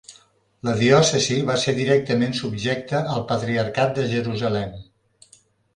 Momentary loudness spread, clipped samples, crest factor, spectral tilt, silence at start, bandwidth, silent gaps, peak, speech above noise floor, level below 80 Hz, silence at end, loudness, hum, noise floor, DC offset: 9 LU; under 0.1%; 20 dB; -5 dB/octave; 0.1 s; 11 kHz; none; -2 dBFS; 36 dB; -54 dBFS; 0.9 s; -21 LUFS; none; -56 dBFS; under 0.1%